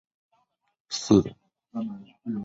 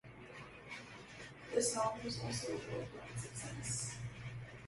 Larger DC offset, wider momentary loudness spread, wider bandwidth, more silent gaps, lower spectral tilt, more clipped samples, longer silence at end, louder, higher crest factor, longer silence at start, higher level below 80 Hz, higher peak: neither; about the same, 17 LU vs 16 LU; second, 7.8 kHz vs 12 kHz; neither; first, -6 dB/octave vs -3.5 dB/octave; neither; about the same, 0 s vs 0 s; first, -26 LUFS vs -42 LUFS; about the same, 24 dB vs 22 dB; first, 0.9 s vs 0.05 s; first, -56 dBFS vs -64 dBFS; first, -6 dBFS vs -22 dBFS